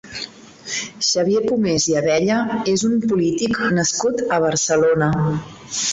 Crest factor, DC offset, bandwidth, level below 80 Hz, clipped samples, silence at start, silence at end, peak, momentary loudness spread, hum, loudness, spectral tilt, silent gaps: 14 dB; under 0.1%; 8.2 kHz; -50 dBFS; under 0.1%; 0.05 s; 0 s; -6 dBFS; 10 LU; none; -19 LUFS; -4 dB/octave; none